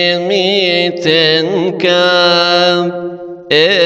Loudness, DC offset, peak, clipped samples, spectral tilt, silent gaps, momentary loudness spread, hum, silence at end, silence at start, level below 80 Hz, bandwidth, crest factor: -11 LUFS; under 0.1%; 0 dBFS; under 0.1%; -4.5 dB/octave; none; 9 LU; none; 0 s; 0 s; -58 dBFS; 8.4 kHz; 12 dB